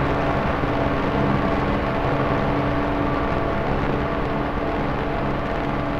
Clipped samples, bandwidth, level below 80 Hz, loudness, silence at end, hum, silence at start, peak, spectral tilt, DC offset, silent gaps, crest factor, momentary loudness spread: under 0.1%; 12.5 kHz; -32 dBFS; -23 LUFS; 0 s; none; 0 s; -6 dBFS; -8 dB/octave; under 0.1%; none; 14 dB; 3 LU